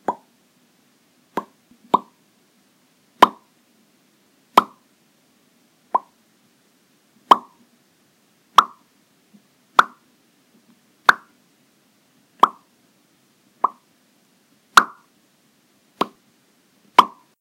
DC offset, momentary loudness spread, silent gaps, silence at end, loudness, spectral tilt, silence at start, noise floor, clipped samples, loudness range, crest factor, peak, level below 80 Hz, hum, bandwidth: under 0.1%; 16 LU; none; 0.35 s; -19 LUFS; -2 dB/octave; 0.1 s; -60 dBFS; under 0.1%; 5 LU; 24 dB; 0 dBFS; -66 dBFS; none; 16 kHz